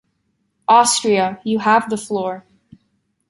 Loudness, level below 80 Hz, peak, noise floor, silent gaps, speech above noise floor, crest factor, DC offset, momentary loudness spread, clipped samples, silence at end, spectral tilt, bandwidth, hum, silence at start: -17 LUFS; -64 dBFS; -2 dBFS; -68 dBFS; none; 52 dB; 18 dB; under 0.1%; 14 LU; under 0.1%; 0.9 s; -3 dB/octave; 11.5 kHz; none; 0.7 s